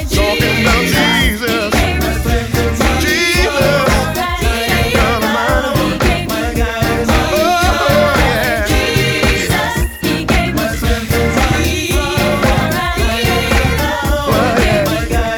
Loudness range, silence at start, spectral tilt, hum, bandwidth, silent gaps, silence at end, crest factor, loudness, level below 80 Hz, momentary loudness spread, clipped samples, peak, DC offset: 1 LU; 0 s; -4.5 dB/octave; none; over 20 kHz; none; 0 s; 12 dB; -13 LUFS; -20 dBFS; 5 LU; under 0.1%; 0 dBFS; under 0.1%